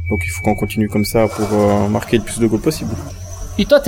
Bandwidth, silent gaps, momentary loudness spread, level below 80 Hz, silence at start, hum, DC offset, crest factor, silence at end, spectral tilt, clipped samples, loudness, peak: 17.5 kHz; none; 11 LU; -32 dBFS; 0 s; none; under 0.1%; 16 dB; 0 s; -6 dB/octave; under 0.1%; -17 LUFS; 0 dBFS